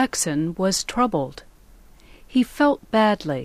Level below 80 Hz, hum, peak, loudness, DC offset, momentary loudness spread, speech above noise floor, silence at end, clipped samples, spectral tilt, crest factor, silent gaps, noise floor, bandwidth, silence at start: -48 dBFS; none; -8 dBFS; -22 LUFS; under 0.1%; 5 LU; 27 dB; 0 s; under 0.1%; -4 dB/octave; 14 dB; none; -49 dBFS; 15.5 kHz; 0 s